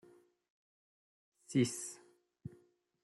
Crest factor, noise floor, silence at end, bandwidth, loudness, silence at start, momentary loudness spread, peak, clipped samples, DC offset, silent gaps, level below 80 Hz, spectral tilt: 24 dB; -69 dBFS; 0.55 s; 12.5 kHz; -37 LUFS; 1.5 s; 20 LU; -20 dBFS; under 0.1%; under 0.1%; none; -78 dBFS; -5 dB/octave